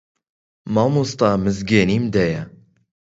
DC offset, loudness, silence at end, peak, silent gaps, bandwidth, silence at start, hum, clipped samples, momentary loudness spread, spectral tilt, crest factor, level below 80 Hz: under 0.1%; -19 LUFS; 0.65 s; -2 dBFS; none; 8 kHz; 0.65 s; none; under 0.1%; 12 LU; -6.5 dB/octave; 20 dB; -46 dBFS